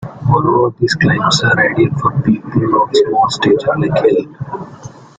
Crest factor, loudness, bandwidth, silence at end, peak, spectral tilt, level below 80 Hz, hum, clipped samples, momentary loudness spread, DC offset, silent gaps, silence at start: 14 dB; -13 LUFS; 9.4 kHz; 0.25 s; 0 dBFS; -5.5 dB/octave; -44 dBFS; none; under 0.1%; 10 LU; under 0.1%; none; 0 s